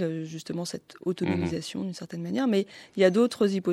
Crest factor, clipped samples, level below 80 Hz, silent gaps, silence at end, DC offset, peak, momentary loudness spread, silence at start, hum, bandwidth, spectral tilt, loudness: 20 dB; under 0.1%; -68 dBFS; none; 0 s; under 0.1%; -8 dBFS; 13 LU; 0 s; none; 14 kHz; -6 dB/octave; -28 LUFS